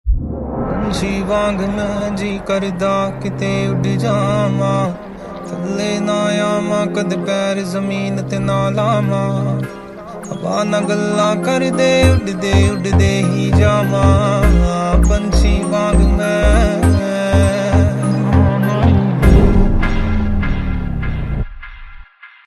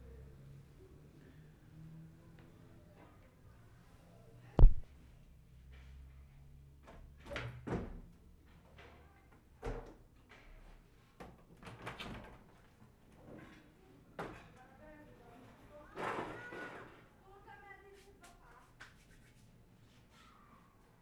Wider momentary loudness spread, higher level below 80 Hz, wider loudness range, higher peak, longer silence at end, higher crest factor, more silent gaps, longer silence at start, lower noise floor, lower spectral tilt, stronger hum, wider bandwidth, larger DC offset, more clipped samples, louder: second, 9 LU vs 20 LU; first, -22 dBFS vs -40 dBFS; second, 5 LU vs 20 LU; first, 0 dBFS vs -10 dBFS; second, 0.2 s vs 4.2 s; second, 14 dB vs 30 dB; neither; second, 0.05 s vs 4.55 s; second, -38 dBFS vs -64 dBFS; about the same, -6.5 dB/octave vs -7 dB/octave; neither; first, 13.5 kHz vs 6 kHz; neither; neither; first, -16 LUFS vs -42 LUFS